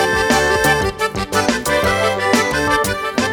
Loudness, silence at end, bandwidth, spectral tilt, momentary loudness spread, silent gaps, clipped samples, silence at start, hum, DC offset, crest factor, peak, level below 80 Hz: -16 LUFS; 0 s; over 20 kHz; -3.5 dB/octave; 5 LU; none; under 0.1%; 0 s; none; under 0.1%; 16 dB; 0 dBFS; -36 dBFS